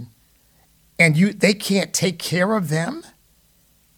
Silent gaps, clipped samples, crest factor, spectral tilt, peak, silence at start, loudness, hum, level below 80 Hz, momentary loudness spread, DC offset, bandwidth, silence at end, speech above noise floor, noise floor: none; under 0.1%; 20 dB; -4.5 dB/octave; -2 dBFS; 0 s; -19 LUFS; none; -60 dBFS; 12 LU; under 0.1%; 19 kHz; 0.95 s; 39 dB; -58 dBFS